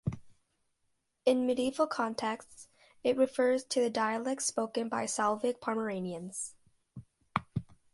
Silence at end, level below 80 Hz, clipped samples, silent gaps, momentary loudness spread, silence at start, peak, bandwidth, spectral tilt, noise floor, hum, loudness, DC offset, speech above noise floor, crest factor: 0.2 s; -64 dBFS; under 0.1%; none; 11 LU; 0.05 s; -12 dBFS; 11.5 kHz; -4.5 dB/octave; -78 dBFS; none; -33 LUFS; under 0.1%; 47 dB; 22 dB